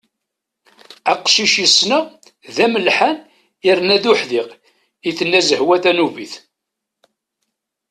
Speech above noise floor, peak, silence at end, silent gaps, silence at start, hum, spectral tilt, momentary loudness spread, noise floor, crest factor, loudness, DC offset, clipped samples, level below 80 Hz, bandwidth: 65 dB; 0 dBFS; 1.55 s; none; 1.05 s; none; -2 dB/octave; 17 LU; -80 dBFS; 18 dB; -14 LUFS; under 0.1%; under 0.1%; -64 dBFS; 13 kHz